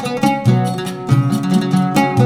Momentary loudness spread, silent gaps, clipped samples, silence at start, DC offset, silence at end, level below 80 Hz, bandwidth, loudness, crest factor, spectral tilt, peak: 3 LU; none; under 0.1%; 0 s; under 0.1%; 0 s; -50 dBFS; 16.5 kHz; -16 LUFS; 14 dB; -7 dB/octave; 0 dBFS